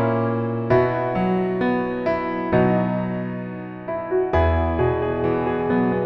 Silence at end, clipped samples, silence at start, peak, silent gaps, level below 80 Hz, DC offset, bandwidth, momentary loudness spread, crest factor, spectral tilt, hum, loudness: 0 s; under 0.1%; 0 s; -6 dBFS; none; -36 dBFS; under 0.1%; 6 kHz; 9 LU; 16 dB; -10 dB/octave; none; -22 LUFS